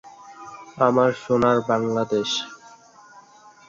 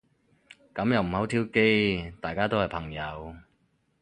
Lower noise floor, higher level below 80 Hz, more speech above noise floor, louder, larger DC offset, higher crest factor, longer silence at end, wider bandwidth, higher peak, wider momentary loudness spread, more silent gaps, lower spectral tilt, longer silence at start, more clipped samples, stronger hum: second, -49 dBFS vs -70 dBFS; second, -60 dBFS vs -50 dBFS; second, 29 dB vs 43 dB; first, -21 LUFS vs -27 LUFS; neither; about the same, 20 dB vs 20 dB; about the same, 0.5 s vs 0.6 s; second, 7.6 kHz vs 10 kHz; first, -4 dBFS vs -8 dBFS; first, 22 LU vs 15 LU; neither; second, -5 dB/octave vs -6.5 dB/octave; second, 0.05 s vs 0.75 s; neither; neither